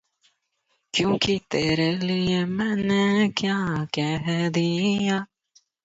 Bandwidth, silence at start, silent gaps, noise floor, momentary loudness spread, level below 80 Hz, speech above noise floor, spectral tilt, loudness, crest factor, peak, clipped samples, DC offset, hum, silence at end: 8 kHz; 0.95 s; none; -73 dBFS; 5 LU; -54 dBFS; 50 dB; -5.5 dB/octave; -23 LUFS; 16 dB; -8 dBFS; under 0.1%; under 0.1%; none; 0.6 s